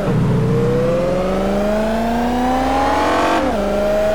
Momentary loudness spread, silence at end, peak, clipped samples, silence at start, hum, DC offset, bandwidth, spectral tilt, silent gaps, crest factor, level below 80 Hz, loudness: 2 LU; 0 s; -6 dBFS; under 0.1%; 0 s; none; 3%; 19 kHz; -6.5 dB/octave; none; 10 dB; -32 dBFS; -17 LUFS